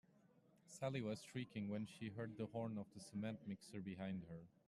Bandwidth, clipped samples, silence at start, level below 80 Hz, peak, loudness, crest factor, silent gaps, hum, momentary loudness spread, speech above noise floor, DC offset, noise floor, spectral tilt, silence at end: 13 kHz; under 0.1%; 0.25 s; -82 dBFS; -32 dBFS; -49 LUFS; 18 dB; none; none; 6 LU; 25 dB; under 0.1%; -73 dBFS; -6.5 dB/octave; 0.2 s